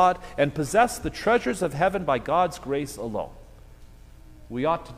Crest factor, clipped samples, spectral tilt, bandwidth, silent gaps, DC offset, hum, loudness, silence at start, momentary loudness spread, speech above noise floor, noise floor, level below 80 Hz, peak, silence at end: 20 dB; under 0.1%; -5 dB/octave; 15.5 kHz; none; under 0.1%; none; -25 LUFS; 0 s; 10 LU; 23 dB; -47 dBFS; -46 dBFS; -6 dBFS; 0 s